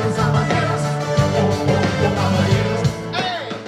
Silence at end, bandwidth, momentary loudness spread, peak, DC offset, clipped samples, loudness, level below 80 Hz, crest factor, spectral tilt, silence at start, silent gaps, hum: 0 s; 13.5 kHz; 5 LU; -4 dBFS; under 0.1%; under 0.1%; -18 LUFS; -40 dBFS; 14 dB; -6 dB/octave; 0 s; none; none